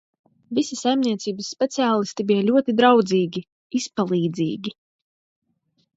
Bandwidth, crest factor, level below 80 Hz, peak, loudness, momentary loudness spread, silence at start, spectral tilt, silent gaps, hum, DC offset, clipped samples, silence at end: 8 kHz; 20 dB; -70 dBFS; -2 dBFS; -21 LUFS; 12 LU; 0.5 s; -5 dB/octave; 3.52-3.70 s; none; under 0.1%; under 0.1%; 1.25 s